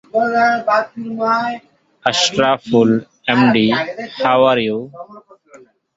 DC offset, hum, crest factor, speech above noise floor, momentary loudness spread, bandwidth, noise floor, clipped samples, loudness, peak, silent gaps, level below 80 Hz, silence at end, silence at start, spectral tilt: under 0.1%; none; 16 dB; 30 dB; 12 LU; 7.8 kHz; -46 dBFS; under 0.1%; -16 LUFS; 0 dBFS; none; -58 dBFS; 0.75 s; 0.15 s; -4.5 dB/octave